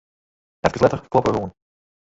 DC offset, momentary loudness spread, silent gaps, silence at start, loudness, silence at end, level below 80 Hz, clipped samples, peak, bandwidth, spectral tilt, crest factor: under 0.1%; 8 LU; none; 0.65 s; -21 LUFS; 0.7 s; -46 dBFS; under 0.1%; -2 dBFS; 8 kHz; -6.5 dB/octave; 22 dB